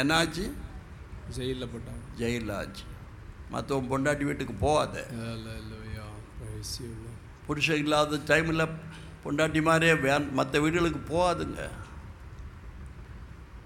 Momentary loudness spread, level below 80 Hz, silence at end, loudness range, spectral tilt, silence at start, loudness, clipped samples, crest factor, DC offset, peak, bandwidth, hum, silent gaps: 21 LU; -46 dBFS; 0 s; 8 LU; -5 dB/octave; 0 s; -28 LUFS; under 0.1%; 22 dB; under 0.1%; -8 dBFS; 17.5 kHz; none; none